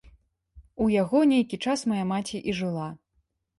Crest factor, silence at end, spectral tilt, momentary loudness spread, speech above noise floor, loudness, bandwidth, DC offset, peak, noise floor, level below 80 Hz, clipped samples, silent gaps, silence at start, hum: 16 dB; 0.65 s; -6 dB/octave; 10 LU; 48 dB; -26 LUFS; 11.5 kHz; under 0.1%; -10 dBFS; -73 dBFS; -56 dBFS; under 0.1%; none; 0.55 s; none